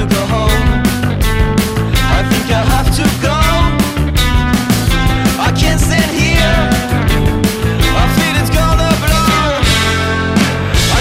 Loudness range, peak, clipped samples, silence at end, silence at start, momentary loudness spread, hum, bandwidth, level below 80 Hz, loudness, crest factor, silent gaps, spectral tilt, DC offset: 1 LU; 0 dBFS; under 0.1%; 0 s; 0 s; 3 LU; none; 16.5 kHz; -16 dBFS; -12 LUFS; 12 dB; none; -5 dB/octave; under 0.1%